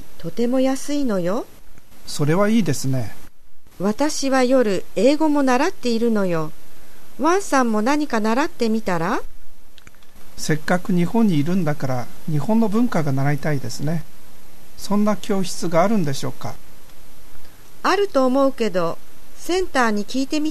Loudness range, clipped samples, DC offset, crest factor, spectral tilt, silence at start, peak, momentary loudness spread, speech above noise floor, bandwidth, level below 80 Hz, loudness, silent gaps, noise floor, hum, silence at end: 4 LU; under 0.1%; 7%; 18 dB; -5.5 dB/octave; 0 s; -4 dBFS; 10 LU; 24 dB; 14 kHz; -46 dBFS; -21 LUFS; none; -44 dBFS; none; 0 s